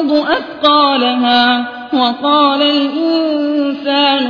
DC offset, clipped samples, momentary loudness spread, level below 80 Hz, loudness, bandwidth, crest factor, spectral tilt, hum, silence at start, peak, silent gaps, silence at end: under 0.1%; under 0.1%; 6 LU; -56 dBFS; -12 LUFS; 5.4 kHz; 12 dB; -4.5 dB/octave; none; 0 s; 0 dBFS; none; 0 s